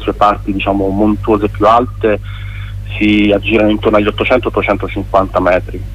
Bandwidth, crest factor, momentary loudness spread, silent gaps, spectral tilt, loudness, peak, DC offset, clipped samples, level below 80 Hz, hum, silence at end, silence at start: 10.5 kHz; 12 dB; 8 LU; none; -7.5 dB/octave; -12 LUFS; 0 dBFS; under 0.1%; under 0.1%; -26 dBFS; 50 Hz at -25 dBFS; 0 s; 0 s